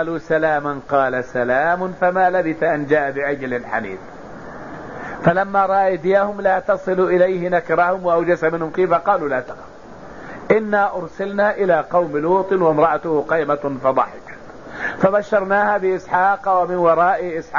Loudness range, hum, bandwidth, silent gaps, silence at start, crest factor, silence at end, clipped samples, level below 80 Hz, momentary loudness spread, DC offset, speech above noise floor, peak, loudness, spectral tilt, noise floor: 3 LU; none; 7.4 kHz; none; 0 s; 16 dB; 0 s; under 0.1%; -52 dBFS; 17 LU; 0.6%; 20 dB; -2 dBFS; -18 LUFS; -7.5 dB/octave; -38 dBFS